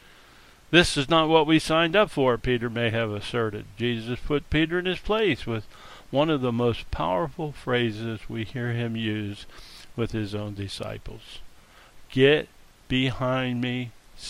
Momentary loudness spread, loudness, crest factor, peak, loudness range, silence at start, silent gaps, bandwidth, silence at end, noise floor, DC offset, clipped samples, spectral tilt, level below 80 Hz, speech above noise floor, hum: 16 LU; -25 LUFS; 24 dB; -2 dBFS; 9 LU; 0.7 s; none; 15.5 kHz; 0 s; -52 dBFS; under 0.1%; under 0.1%; -5.5 dB/octave; -44 dBFS; 27 dB; none